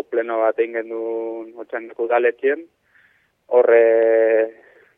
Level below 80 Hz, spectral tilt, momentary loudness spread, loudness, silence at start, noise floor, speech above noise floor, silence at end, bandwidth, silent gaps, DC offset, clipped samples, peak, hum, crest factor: -76 dBFS; -6.5 dB/octave; 16 LU; -18 LUFS; 0.1 s; -59 dBFS; 40 dB; 0.45 s; 3.7 kHz; none; under 0.1%; under 0.1%; -4 dBFS; none; 16 dB